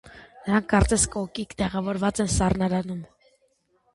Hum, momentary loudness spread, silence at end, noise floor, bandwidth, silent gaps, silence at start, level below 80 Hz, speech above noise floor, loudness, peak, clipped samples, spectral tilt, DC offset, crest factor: none; 12 LU; 0.9 s; -68 dBFS; 11.5 kHz; none; 0.05 s; -36 dBFS; 44 dB; -24 LUFS; -6 dBFS; under 0.1%; -5 dB/octave; under 0.1%; 20 dB